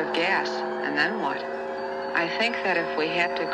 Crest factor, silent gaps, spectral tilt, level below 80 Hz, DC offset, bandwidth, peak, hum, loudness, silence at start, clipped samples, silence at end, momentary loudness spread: 18 dB; none; -4 dB/octave; -66 dBFS; under 0.1%; 10 kHz; -8 dBFS; none; -26 LUFS; 0 s; under 0.1%; 0 s; 8 LU